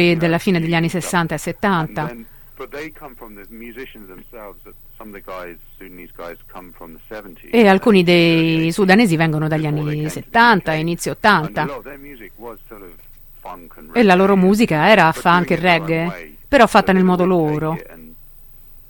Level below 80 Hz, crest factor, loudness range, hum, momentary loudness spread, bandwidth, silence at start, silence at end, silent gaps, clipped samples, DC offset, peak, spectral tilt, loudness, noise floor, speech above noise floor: -44 dBFS; 18 dB; 21 LU; none; 24 LU; 17 kHz; 0 s; 0.75 s; none; under 0.1%; under 0.1%; 0 dBFS; -6 dB/octave; -15 LUFS; -41 dBFS; 24 dB